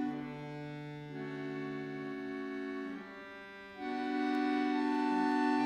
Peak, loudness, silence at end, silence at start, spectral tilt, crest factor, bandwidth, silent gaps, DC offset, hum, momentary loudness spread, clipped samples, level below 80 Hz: -22 dBFS; -37 LUFS; 0 s; 0 s; -6.5 dB/octave; 14 dB; 9.4 kHz; none; under 0.1%; none; 14 LU; under 0.1%; -74 dBFS